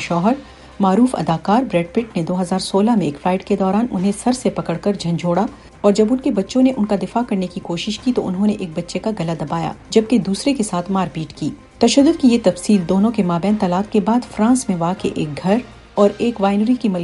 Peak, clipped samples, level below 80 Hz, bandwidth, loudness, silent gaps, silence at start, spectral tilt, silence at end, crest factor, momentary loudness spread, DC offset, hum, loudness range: 0 dBFS; under 0.1%; -46 dBFS; 11.5 kHz; -18 LUFS; none; 0 s; -6 dB/octave; 0 s; 16 dB; 8 LU; under 0.1%; none; 4 LU